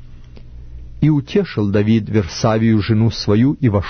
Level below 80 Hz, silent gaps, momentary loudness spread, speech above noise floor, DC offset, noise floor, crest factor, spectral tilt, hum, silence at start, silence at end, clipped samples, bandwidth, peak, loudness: -36 dBFS; none; 4 LU; 21 dB; under 0.1%; -35 dBFS; 14 dB; -7.5 dB/octave; none; 0 s; 0 s; under 0.1%; 6.6 kHz; -2 dBFS; -16 LUFS